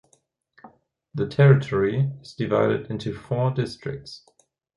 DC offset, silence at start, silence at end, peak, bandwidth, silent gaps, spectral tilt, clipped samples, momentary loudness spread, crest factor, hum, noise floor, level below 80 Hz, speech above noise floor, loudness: under 0.1%; 0.65 s; 0.6 s; -4 dBFS; 10.5 kHz; none; -8.5 dB/octave; under 0.1%; 19 LU; 20 dB; none; -66 dBFS; -54 dBFS; 43 dB; -23 LUFS